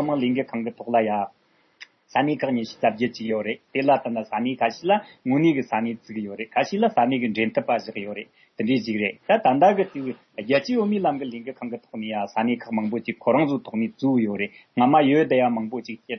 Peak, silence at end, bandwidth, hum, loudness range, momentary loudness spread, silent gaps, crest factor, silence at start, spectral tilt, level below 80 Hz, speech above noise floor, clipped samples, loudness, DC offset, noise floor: -6 dBFS; 0 s; 6.4 kHz; none; 4 LU; 14 LU; none; 18 dB; 0 s; -7 dB/octave; -72 dBFS; 27 dB; under 0.1%; -23 LUFS; under 0.1%; -50 dBFS